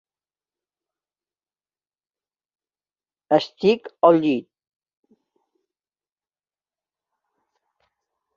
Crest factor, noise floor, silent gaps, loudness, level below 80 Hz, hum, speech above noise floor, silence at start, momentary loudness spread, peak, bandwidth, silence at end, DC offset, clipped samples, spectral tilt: 24 dB; under -90 dBFS; none; -20 LUFS; -72 dBFS; 50 Hz at -65 dBFS; over 71 dB; 3.3 s; 7 LU; -2 dBFS; 7.4 kHz; 3.95 s; under 0.1%; under 0.1%; -7 dB/octave